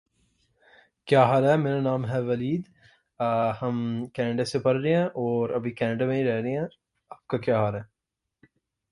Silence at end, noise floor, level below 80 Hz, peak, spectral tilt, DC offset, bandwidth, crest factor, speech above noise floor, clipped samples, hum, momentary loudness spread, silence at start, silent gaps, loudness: 1.05 s; -85 dBFS; -62 dBFS; -6 dBFS; -7.5 dB/octave; under 0.1%; 11.5 kHz; 20 dB; 61 dB; under 0.1%; none; 10 LU; 1.05 s; none; -26 LUFS